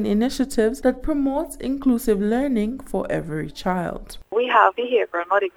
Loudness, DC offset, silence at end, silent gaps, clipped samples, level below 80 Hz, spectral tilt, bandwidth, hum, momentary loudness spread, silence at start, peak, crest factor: -22 LUFS; under 0.1%; 0.1 s; none; under 0.1%; -40 dBFS; -5.5 dB/octave; 17 kHz; none; 9 LU; 0 s; 0 dBFS; 20 dB